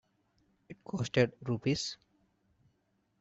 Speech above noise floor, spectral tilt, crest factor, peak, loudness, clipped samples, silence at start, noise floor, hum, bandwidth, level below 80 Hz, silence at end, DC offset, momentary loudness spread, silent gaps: 44 dB; -5.5 dB/octave; 24 dB; -12 dBFS; -33 LUFS; under 0.1%; 0.7 s; -76 dBFS; none; 8.2 kHz; -66 dBFS; 1.25 s; under 0.1%; 17 LU; none